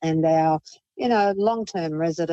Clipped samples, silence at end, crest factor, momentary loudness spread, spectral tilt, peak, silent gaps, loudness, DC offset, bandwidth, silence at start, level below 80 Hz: under 0.1%; 0 s; 12 dB; 8 LU; -6.5 dB/octave; -10 dBFS; none; -23 LUFS; under 0.1%; 8.2 kHz; 0 s; -62 dBFS